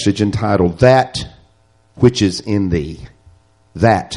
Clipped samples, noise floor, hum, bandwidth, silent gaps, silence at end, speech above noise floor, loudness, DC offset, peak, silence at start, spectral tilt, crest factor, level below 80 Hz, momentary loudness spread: under 0.1%; -54 dBFS; none; 11.5 kHz; none; 0 s; 40 dB; -15 LUFS; under 0.1%; 0 dBFS; 0 s; -6 dB/octave; 16 dB; -38 dBFS; 18 LU